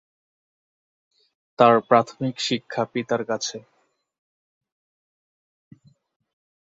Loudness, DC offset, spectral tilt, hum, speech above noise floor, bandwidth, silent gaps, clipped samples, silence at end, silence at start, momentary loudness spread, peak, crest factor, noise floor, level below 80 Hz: -22 LUFS; under 0.1%; -4.5 dB/octave; none; over 69 dB; 7.8 kHz; none; under 0.1%; 3.1 s; 1.6 s; 11 LU; -2 dBFS; 24 dB; under -90 dBFS; -70 dBFS